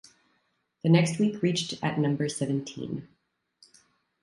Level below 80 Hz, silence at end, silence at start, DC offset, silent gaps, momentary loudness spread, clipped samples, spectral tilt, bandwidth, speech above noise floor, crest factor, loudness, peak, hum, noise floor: -68 dBFS; 1.15 s; 0.85 s; under 0.1%; none; 14 LU; under 0.1%; -6 dB/octave; 11.5 kHz; 47 dB; 20 dB; -27 LUFS; -10 dBFS; none; -73 dBFS